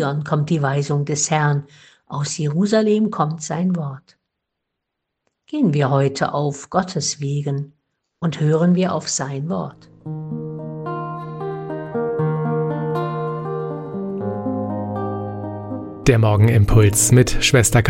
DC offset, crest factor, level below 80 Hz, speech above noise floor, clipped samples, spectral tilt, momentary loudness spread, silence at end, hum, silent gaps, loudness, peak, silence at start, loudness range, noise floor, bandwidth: under 0.1%; 18 dB; -36 dBFS; 61 dB; under 0.1%; -5.5 dB/octave; 15 LU; 0 s; none; none; -20 LUFS; -2 dBFS; 0 s; 7 LU; -79 dBFS; 16 kHz